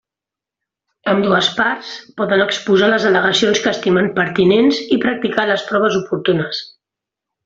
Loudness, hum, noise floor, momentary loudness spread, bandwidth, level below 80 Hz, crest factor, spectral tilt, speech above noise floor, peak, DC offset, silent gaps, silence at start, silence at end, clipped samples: -15 LUFS; none; -87 dBFS; 7 LU; 7.8 kHz; -56 dBFS; 16 dB; -4.5 dB/octave; 71 dB; 0 dBFS; under 0.1%; none; 1.05 s; 0.8 s; under 0.1%